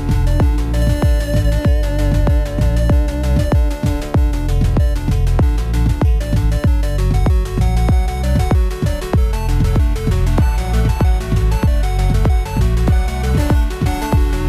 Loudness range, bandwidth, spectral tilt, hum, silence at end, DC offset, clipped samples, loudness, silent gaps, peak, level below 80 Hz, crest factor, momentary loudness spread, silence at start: 1 LU; 13.5 kHz; -7 dB/octave; none; 0 s; under 0.1%; under 0.1%; -17 LUFS; none; -4 dBFS; -16 dBFS; 10 dB; 2 LU; 0 s